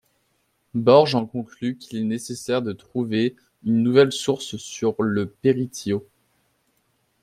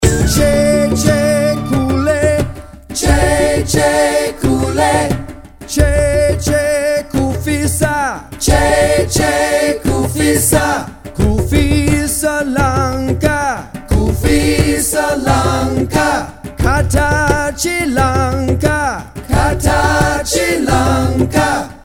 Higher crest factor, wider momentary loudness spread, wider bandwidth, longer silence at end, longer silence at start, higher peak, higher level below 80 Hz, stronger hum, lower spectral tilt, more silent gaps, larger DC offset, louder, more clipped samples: first, 20 dB vs 14 dB; first, 13 LU vs 6 LU; second, 14.5 kHz vs 17.5 kHz; first, 1.2 s vs 0.05 s; first, 0.75 s vs 0 s; about the same, -2 dBFS vs 0 dBFS; second, -64 dBFS vs -22 dBFS; neither; about the same, -5.5 dB/octave vs -5 dB/octave; neither; neither; second, -22 LUFS vs -14 LUFS; neither